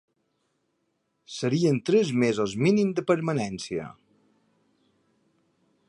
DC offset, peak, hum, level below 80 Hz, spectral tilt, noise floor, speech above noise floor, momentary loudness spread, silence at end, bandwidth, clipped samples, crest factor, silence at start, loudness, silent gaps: under 0.1%; -8 dBFS; none; -66 dBFS; -6.5 dB/octave; -75 dBFS; 51 dB; 12 LU; 1.95 s; 11 kHz; under 0.1%; 18 dB; 1.3 s; -25 LUFS; none